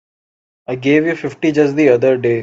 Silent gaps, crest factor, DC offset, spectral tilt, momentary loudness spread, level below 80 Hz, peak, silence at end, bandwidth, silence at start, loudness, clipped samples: none; 14 dB; under 0.1%; -7 dB/octave; 10 LU; -58 dBFS; 0 dBFS; 0 s; 7.8 kHz; 0.7 s; -14 LUFS; under 0.1%